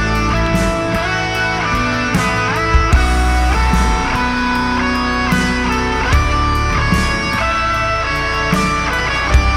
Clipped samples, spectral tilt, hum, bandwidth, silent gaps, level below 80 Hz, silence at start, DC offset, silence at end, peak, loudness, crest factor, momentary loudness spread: under 0.1%; -5 dB/octave; none; 14.5 kHz; none; -20 dBFS; 0 s; under 0.1%; 0 s; -2 dBFS; -15 LUFS; 14 dB; 2 LU